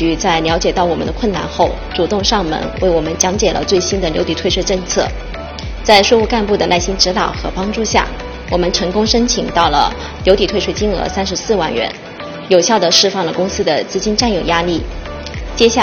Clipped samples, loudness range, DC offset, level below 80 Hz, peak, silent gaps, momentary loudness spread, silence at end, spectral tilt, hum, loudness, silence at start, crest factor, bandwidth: under 0.1%; 2 LU; under 0.1%; -28 dBFS; 0 dBFS; none; 10 LU; 0 s; -3.5 dB/octave; none; -14 LUFS; 0 s; 14 dB; 20 kHz